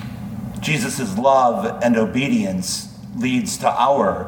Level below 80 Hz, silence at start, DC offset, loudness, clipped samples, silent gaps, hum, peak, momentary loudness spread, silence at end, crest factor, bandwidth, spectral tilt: -48 dBFS; 0 s; under 0.1%; -19 LUFS; under 0.1%; none; none; -2 dBFS; 11 LU; 0 s; 16 dB; 19 kHz; -5 dB/octave